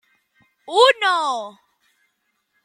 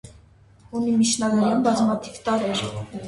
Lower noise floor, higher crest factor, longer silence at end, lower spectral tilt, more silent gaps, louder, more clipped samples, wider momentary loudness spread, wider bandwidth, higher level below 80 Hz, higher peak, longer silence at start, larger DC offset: first, -71 dBFS vs -52 dBFS; first, 20 dB vs 14 dB; first, 1.15 s vs 0 s; second, 0 dB/octave vs -4.5 dB/octave; neither; first, -17 LUFS vs -22 LUFS; neither; first, 14 LU vs 8 LU; first, 14.5 kHz vs 11.5 kHz; second, -78 dBFS vs -54 dBFS; first, -2 dBFS vs -8 dBFS; first, 0.7 s vs 0.05 s; neither